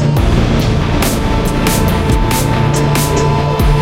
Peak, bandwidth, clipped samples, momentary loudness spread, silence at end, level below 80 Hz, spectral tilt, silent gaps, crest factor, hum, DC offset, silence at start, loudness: 0 dBFS; 17 kHz; under 0.1%; 1 LU; 0 s; -18 dBFS; -5.5 dB/octave; none; 12 dB; none; under 0.1%; 0 s; -13 LUFS